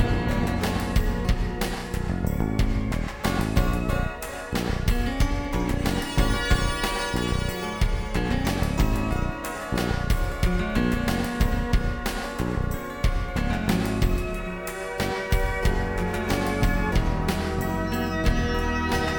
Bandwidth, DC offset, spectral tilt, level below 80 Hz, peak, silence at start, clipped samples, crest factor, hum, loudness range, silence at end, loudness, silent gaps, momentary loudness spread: over 20 kHz; under 0.1%; -5.5 dB/octave; -28 dBFS; -8 dBFS; 0 s; under 0.1%; 16 dB; none; 1 LU; 0 s; -26 LUFS; none; 5 LU